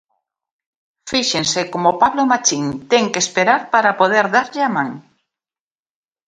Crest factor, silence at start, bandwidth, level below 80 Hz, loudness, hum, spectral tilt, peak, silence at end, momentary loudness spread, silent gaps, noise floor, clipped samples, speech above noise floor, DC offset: 18 dB; 1.05 s; 10.5 kHz; -60 dBFS; -16 LUFS; none; -2.5 dB/octave; 0 dBFS; 1.3 s; 5 LU; none; under -90 dBFS; under 0.1%; over 74 dB; under 0.1%